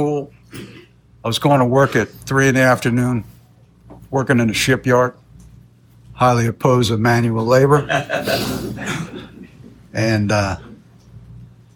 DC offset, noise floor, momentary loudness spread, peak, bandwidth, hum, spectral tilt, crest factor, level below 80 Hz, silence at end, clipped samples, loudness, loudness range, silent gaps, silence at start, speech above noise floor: under 0.1%; -48 dBFS; 14 LU; -2 dBFS; 19 kHz; none; -5.5 dB/octave; 16 dB; -46 dBFS; 0.3 s; under 0.1%; -17 LUFS; 5 LU; none; 0 s; 32 dB